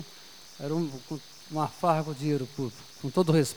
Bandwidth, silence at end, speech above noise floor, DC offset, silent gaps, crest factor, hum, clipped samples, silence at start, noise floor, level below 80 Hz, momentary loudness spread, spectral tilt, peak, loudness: over 20 kHz; 0 s; 21 dB; 0.2%; none; 20 dB; none; under 0.1%; 0 s; -50 dBFS; -68 dBFS; 15 LU; -6 dB/octave; -10 dBFS; -30 LUFS